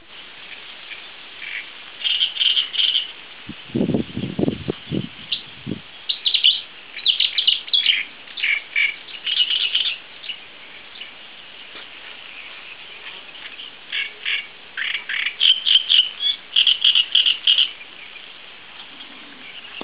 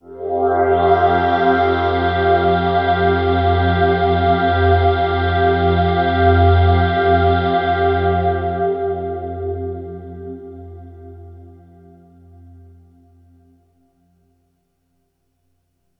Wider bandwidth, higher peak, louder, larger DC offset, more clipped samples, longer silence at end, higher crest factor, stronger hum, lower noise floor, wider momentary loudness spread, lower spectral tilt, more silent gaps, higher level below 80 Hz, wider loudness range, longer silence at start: second, 4 kHz vs 5.4 kHz; about the same, -2 dBFS vs -2 dBFS; about the same, -17 LUFS vs -16 LUFS; first, 0.4% vs under 0.1%; neither; second, 0 s vs 4.5 s; first, 22 dB vs 16 dB; neither; second, -41 dBFS vs -67 dBFS; first, 22 LU vs 14 LU; second, 0 dB/octave vs -9.5 dB/octave; neither; second, -56 dBFS vs -38 dBFS; about the same, 14 LU vs 15 LU; about the same, 0.1 s vs 0.05 s